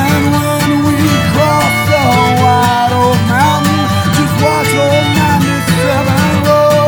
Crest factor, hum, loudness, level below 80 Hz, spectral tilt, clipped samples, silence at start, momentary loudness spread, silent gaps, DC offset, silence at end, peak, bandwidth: 10 dB; none; -10 LUFS; -34 dBFS; -5.5 dB/octave; under 0.1%; 0 s; 3 LU; none; under 0.1%; 0 s; 0 dBFS; over 20 kHz